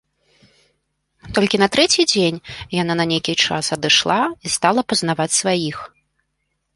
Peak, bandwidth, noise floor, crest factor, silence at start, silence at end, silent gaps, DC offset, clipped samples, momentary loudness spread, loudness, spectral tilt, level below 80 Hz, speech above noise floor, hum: 0 dBFS; 11.5 kHz; -72 dBFS; 18 dB; 1.25 s; 0.9 s; none; under 0.1%; under 0.1%; 9 LU; -17 LUFS; -3 dB/octave; -52 dBFS; 54 dB; none